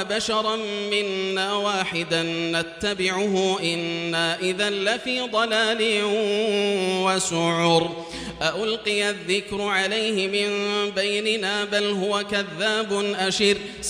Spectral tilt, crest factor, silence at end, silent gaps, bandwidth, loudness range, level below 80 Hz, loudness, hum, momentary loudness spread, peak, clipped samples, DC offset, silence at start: -3 dB/octave; 18 dB; 0 s; none; 15.5 kHz; 2 LU; -56 dBFS; -23 LUFS; none; 4 LU; -4 dBFS; under 0.1%; under 0.1%; 0 s